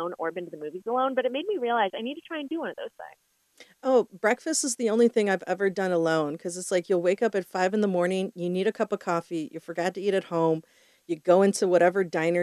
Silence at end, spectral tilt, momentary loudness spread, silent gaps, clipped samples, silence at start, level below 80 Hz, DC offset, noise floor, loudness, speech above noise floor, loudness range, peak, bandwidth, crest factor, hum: 0 s; -4.5 dB/octave; 13 LU; none; under 0.1%; 0 s; -80 dBFS; under 0.1%; -56 dBFS; -26 LUFS; 31 dB; 4 LU; -8 dBFS; 13.5 kHz; 18 dB; none